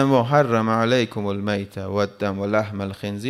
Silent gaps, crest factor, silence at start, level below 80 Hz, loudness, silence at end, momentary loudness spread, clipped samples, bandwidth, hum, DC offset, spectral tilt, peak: none; 18 dB; 0 s; -64 dBFS; -22 LUFS; 0 s; 9 LU; under 0.1%; 14 kHz; none; under 0.1%; -6.5 dB/octave; -4 dBFS